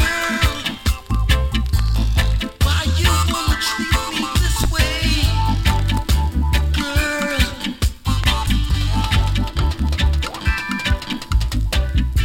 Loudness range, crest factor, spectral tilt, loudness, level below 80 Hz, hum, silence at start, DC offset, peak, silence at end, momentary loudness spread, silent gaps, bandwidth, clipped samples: 2 LU; 16 dB; -4.5 dB/octave; -19 LUFS; -20 dBFS; none; 0 s; under 0.1%; -2 dBFS; 0 s; 4 LU; none; 17 kHz; under 0.1%